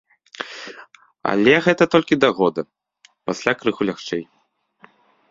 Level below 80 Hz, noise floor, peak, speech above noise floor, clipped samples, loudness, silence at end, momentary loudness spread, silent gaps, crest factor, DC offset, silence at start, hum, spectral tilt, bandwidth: -60 dBFS; -66 dBFS; 0 dBFS; 48 dB; under 0.1%; -19 LUFS; 1.1 s; 18 LU; none; 22 dB; under 0.1%; 0.4 s; none; -5.5 dB/octave; 7.8 kHz